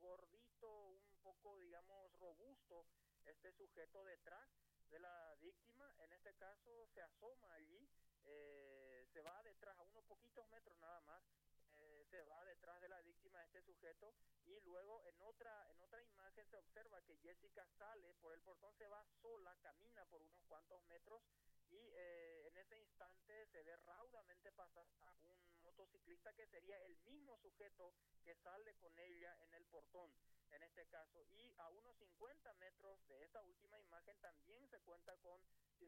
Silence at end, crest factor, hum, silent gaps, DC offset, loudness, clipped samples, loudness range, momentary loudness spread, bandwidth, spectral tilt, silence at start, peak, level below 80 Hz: 0 s; 22 dB; 50 Hz at -90 dBFS; none; under 0.1%; -66 LUFS; under 0.1%; 2 LU; 6 LU; 16 kHz; -4 dB/octave; 0 s; -44 dBFS; -86 dBFS